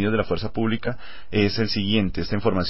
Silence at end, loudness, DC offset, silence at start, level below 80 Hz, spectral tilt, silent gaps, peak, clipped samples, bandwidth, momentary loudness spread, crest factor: 0 s; -24 LUFS; 3%; 0 s; -40 dBFS; -9.5 dB/octave; none; -6 dBFS; under 0.1%; 5.8 kHz; 6 LU; 16 dB